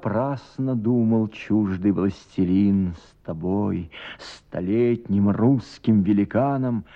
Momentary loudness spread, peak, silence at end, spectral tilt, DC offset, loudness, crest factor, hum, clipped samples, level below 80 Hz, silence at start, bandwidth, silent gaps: 13 LU; -8 dBFS; 0.1 s; -9 dB/octave; under 0.1%; -22 LUFS; 14 dB; none; under 0.1%; -52 dBFS; 0 s; 7.8 kHz; none